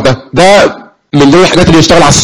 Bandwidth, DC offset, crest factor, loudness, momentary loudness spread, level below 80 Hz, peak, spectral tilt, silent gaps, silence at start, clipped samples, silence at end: 18 kHz; under 0.1%; 6 dB; -5 LUFS; 7 LU; -26 dBFS; 0 dBFS; -4.5 dB/octave; none; 0 s; 2%; 0 s